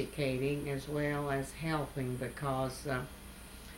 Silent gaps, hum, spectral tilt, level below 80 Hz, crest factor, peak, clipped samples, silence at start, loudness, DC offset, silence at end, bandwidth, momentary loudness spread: none; none; -6 dB/octave; -52 dBFS; 16 dB; -20 dBFS; under 0.1%; 0 s; -36 LUFS; under 0.1%; 0 s; 17 kHz; 10 LU